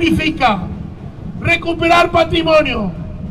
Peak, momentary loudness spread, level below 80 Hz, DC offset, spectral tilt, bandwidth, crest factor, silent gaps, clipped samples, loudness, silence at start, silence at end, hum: -4 dBFS; 17 LU; -32 dBFS; under 0.1%; -5.5 dB/octave; 14 kHz; 12 dB; none; under 0.1%; -14 LUFS; 0 s; 0 s; none